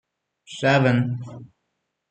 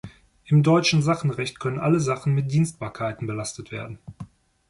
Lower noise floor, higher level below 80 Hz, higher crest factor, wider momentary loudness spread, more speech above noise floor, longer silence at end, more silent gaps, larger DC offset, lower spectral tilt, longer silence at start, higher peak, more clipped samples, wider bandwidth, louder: first, -77 dBFS vs -43 dBFS; second, -62 dBFS vs -56 dBFS; about the same, 20 dB vs 16 dB; about the same, 21 LU vs 20 LU; first, 56 dB vs 21 dB; first, 0.65 s vs 0.45 s; neither; neither; about the same, -6.5 dB/octave vs -6 dB/octave; first, 0.5 s vs 0.05 s; first, -4 dBFS vs -8 dBFS; neither; second, 9 kHz vs 11.5 kHz; about the same, -21 LUFS vs -23 LUFS